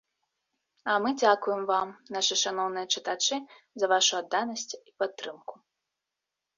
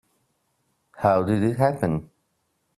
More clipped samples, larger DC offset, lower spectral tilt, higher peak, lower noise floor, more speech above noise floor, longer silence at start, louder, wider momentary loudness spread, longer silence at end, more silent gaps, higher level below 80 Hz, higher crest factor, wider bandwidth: neither; neither; second, -1 dB/octave vs -8.5 dB/octave; about the same, -8 dBFS vs -6 dBFS; first, -87 dBFS vs -72 dBFS; first, 58 dB vs 51 dB; about the same, 0.85 s vs 0.95 s; second, -28 LUFS vs -23 LUFS; first, 15 LU vs 6 LU; first, 1.05 s vs 0.75 s; neither; second, -80 dBFS vs -56 dBFS; about the same, 22 dB vs 20 dB; second, 7.6 kHz vs 13 kHz